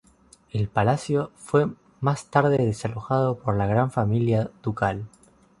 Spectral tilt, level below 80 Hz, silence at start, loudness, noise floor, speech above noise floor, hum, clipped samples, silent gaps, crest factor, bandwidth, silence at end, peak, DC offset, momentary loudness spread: -7.5 dB/octave; -50 dBFS; 0.55 s; -24 LUFS; -56 dBFS; 33 dB; none; under 0.1%; none; 20 dB; 11.5 kHz; 0.55 s; -4 dBFS; under 0.1%; 8 LU